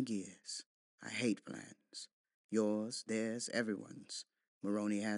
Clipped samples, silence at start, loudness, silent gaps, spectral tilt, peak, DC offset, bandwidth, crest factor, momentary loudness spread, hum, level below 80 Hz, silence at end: under 0.1%; 0 s; -40 LUFS; 0.66-0.98 s, 2.13-2.24 s, 2.34-2.49 s, 4.48-4.61 s; -4 dB/octave; -22 dBFS; under 0.1%; 11.5 kHz; 20 dB; 14 LU; none; under -90 dBFS; 0 s